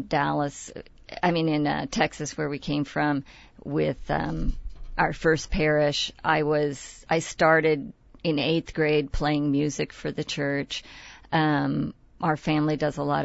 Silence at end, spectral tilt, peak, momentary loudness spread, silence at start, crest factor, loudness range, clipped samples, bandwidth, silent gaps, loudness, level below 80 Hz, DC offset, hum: 0 s; -5.5 dB/octave; -8 dBFS; 12 LU; 0 s; 18 dB; 4 LU; under 0.1%; 8 kHz; none; -26 LUFS; -40 dBFS; under 0.1%; none